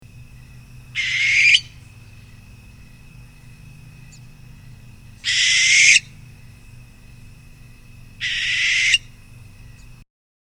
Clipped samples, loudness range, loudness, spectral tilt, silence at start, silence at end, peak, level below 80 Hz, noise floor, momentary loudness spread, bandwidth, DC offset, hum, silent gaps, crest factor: under 0.1%; 5 LU; -15 LUFS; 1.5 dB/octave; 0.15 s; 1.15 s; 0 dBFS; -48 dBFS; -43 dBFS; 13 LU; over 20 kHz; under 0.1%; none; none; 22 dB